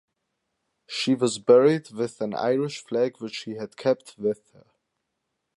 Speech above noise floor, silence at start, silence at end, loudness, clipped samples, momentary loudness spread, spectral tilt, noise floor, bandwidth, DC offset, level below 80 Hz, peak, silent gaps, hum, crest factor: 56 dB; 0.9 s; 1.25 s; -24 LUFS; under 0.1%; 16 LU; -5 dB/octave; -80 dBFS; 11.5 kHz; under 0.1%; -74 dBFS; -6 dBFS; none; none; 20 dB